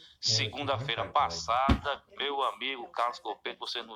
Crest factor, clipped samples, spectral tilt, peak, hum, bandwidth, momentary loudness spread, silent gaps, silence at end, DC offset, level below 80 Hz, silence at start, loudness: 20 dB; under 0.1%; -3.5 dB/octave; -12 dBFS; none; 13.5 kHz; 9 LU; none; 0 s; under 0.1%; -44 dBFS; 0 s; -31 LUFS